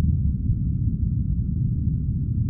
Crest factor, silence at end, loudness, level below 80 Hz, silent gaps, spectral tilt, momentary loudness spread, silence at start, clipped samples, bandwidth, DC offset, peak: 12 dB; 0 s; -25 LUFS; -28 dBFS; none; -18 dB/octave; 2 LU; 0 s; under 0.1%; 0.7 kHz; under 0.1%; -12 dBFS